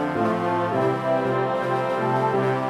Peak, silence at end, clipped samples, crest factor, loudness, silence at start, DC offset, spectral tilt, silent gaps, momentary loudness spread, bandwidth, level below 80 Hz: -10 dBFS; 0 s; under 0.1%; 12 dB; -23 LUFS; 0 s; under 0.1%; -7.5 dB/octave; none; 2 LU; 13 kHz; -62 dBFS